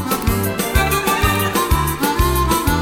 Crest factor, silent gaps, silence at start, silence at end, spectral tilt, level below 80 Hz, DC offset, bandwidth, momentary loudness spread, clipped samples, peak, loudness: 14 dB; none; 0 s; 0 s; -4.5 dB/octave; -24 dBFS; under 0.1%; 18 kHz; 3 LU; under 0.1%; -2 dBFS; -17 LUFS